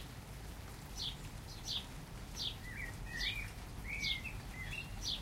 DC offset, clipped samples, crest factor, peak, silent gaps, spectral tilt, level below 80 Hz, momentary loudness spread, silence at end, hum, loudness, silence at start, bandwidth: under 0.1%; under 0.1%; 18 dB; -26 dBFS; none; -2.5 dB/octave; -50 dBFS; 12 LU; 0 s; none; -43 LUFS; 0 s; 16 kHz